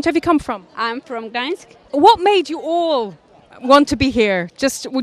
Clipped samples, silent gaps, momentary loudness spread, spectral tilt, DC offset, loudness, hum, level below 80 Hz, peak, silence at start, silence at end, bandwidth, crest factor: under 0.1%; none; 14 LU; -4 dB/octave; under 0.1%; -17 LUFS; none; -44 dBFS; 0 dBFS; 0 s; 0 s; 14.5 kHz; 16 dB